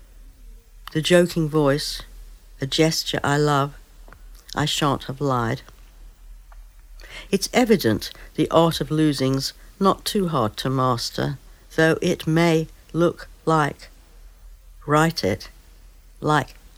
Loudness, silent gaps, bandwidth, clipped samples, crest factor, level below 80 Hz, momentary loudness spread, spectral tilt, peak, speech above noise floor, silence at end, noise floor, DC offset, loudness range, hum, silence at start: -22 LUFS; none; 16.5 kHz; under 0.1%; 20 dB; -44 dBFS; 11 LU; -5 dB/octave; -2 dBFS; 26 dB; 0.25 s; -47 dBFS; under 0.1%; 4 LU; none; 0 s